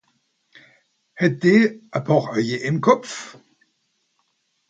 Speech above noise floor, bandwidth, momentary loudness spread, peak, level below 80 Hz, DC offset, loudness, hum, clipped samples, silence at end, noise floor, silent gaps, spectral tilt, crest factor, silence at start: 51 dB; 9 kHz; 16 LU; -2 dBFS; -66 dBFS; under 0.1%; -19 LUFS; none; under 0.1%; 1.4 s; -70 dBFS; none; -6.5 dB/octave; 22 dB; 1.15 s